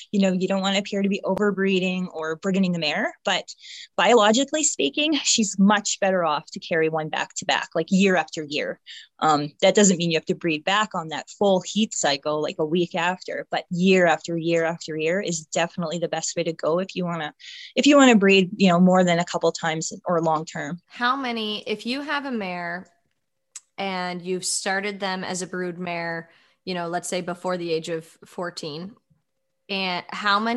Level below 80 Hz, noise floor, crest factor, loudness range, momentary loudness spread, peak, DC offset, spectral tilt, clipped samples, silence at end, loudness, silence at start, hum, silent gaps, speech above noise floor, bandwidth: -70 dBFS; -78 dBFS; 20 dB; 9 LU; 13 LU; -4 dBFS; under 0.1%; -4 dB/octave; under 0.1%; 0 s; -23 LUFS; 0 s; none; none; 55 dB; 12 kHz